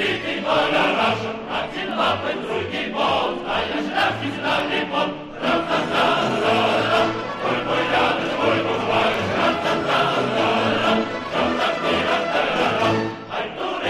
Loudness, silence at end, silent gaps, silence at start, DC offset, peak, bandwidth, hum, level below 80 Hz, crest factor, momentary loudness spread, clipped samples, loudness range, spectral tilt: -21 LUFS; 0 s; none; 0 s; under 0.1%; -6 dBFS; 13 kHz; none; -52 dBFS; 14 dB; 7 LU; under 0.1%; 3 LU; -4.5 dB/octave